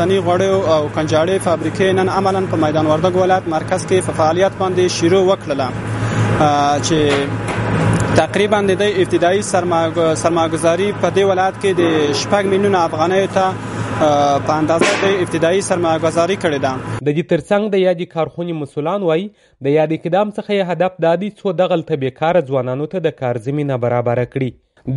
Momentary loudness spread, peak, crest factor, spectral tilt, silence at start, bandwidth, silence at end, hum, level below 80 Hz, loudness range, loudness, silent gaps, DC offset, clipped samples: 6 LU; 0 dBFS; 16 dB; -5.5 dB/octave; 0 s; 11.5 kHz; 0 s; none; -44 dBFS; 3 LU; -16 LUFS; none; under 0.1%; under 0.1%